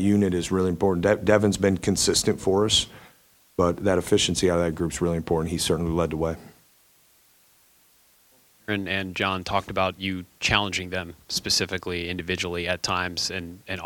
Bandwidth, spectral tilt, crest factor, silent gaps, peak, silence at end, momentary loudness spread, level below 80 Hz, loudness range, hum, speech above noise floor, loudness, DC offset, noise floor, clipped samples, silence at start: 19 kHz; -4 dB/octave; 22 dB; none; -2 dBFS; 0 s; 9 LU; -46 dBFS; 8 LU; none; 35 dB; -24 LUFS; under 0.1%; -60 dBFS; under 0.1%; 0 s